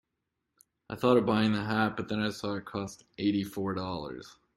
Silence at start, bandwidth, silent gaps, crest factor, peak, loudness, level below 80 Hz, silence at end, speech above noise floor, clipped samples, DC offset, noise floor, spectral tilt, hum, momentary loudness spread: 0.9 s; 14.5 kHz; none; 22 dB; -10 dBFS; -30 LUFS; -64 dBFS; 0.25 s; 54 dB; under 0.1%; under 0.1%; -84 dBFS; -6.5 dB/octave; none; 15 LU